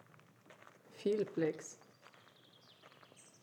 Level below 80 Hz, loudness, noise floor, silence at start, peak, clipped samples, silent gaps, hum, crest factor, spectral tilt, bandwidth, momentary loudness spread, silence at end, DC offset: under -90 dBFS; -39 LUFS; -65 dBFS; 0.5 s; -24 dBFS; under 0.1%; none; none; 20 dB; -5.5 dB/octave; 19 kHz; 26 LU; 0.2 s; under 0.1%